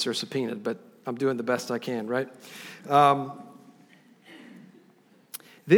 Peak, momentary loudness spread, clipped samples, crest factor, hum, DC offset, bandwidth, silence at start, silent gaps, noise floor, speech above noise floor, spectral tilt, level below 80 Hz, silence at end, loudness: -6 dBFS; 26 LU; under 0.1%; 22 dB; none; under 0.1%; over 20 kHz; 0 s; none; -59 dBFS; 32 dB; -5 dB/octave; -82 dBFS; 0 s; -27 LUFS